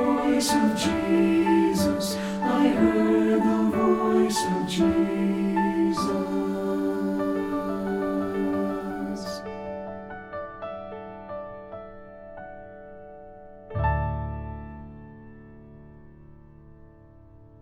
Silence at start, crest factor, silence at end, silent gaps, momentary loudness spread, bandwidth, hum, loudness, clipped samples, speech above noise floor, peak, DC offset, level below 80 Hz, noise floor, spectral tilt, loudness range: 0 s; 18 dB; 0.15 s; none; 21 LU; 16.5 kHz; none; -25 LUFS; under 0.1%; 28 dB; -8 dBFS; under 0.1%; -44 dBFS; -50 dBFS; -5.5 dB/octave; 16 LU